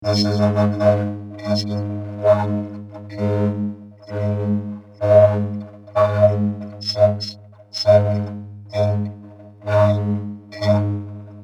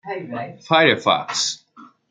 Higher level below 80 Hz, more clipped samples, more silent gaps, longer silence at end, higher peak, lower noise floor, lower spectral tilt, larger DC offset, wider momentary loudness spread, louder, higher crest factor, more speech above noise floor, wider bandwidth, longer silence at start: first, -58 dBFS vs -66 dBFS; neither; neither; second, 0 s vs 0.25 s; about the same, -2 dBFS vs -2 dBFS; second, -40 dBFS vs -48 dBFS; first, -7.5 dB/octave vs -3 dB/octave; neither; about the same, 16 LU vs 16 LU; about the same, -19 LUFS vs -18 LUFS; about the same, 18 dB vs 20 dB; second, 22 dB vs 28 dB; about the same, 9 kHz vs 9.6 kHz; about the same, 0 s vs 0.05 s